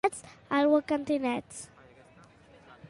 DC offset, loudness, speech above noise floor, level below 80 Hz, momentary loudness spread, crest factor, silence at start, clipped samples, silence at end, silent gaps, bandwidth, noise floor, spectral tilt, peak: under 0.1%; -28 LUFS; 29 dB; -66 dBFS; 20 LU; 18 dB; 0.05 s; under 0.1%; 0.05 s; none; 11.5 kHz; -57 dBFS; -4.5 dB/octave; -12 dBFS